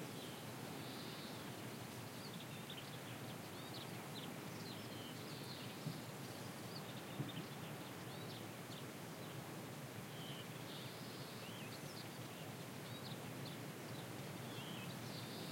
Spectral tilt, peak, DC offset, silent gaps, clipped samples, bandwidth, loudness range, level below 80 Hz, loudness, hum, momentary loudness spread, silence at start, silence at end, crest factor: -4.5 dB/octave; -32 dBFS; under 0.1%; none; under 0.1%; 16.5 kHz; 1 LU; -82 dBFS; -50 LUFS; none; 2 LU; 0 s; 0 s; 18 dB